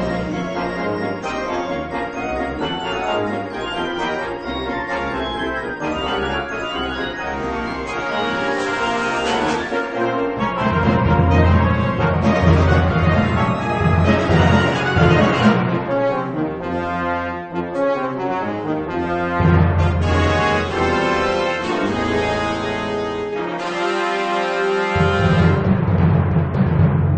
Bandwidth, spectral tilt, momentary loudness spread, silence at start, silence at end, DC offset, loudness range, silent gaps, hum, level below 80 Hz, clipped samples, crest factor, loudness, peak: 8.8 kHz; -7 dB/octave; 9 LU; 0 s; 0 s; under 0.1%; 7 LU; none; none; -34 dBFS; under 0.1%; 16 dB; -19 LUFS; -2 dBFS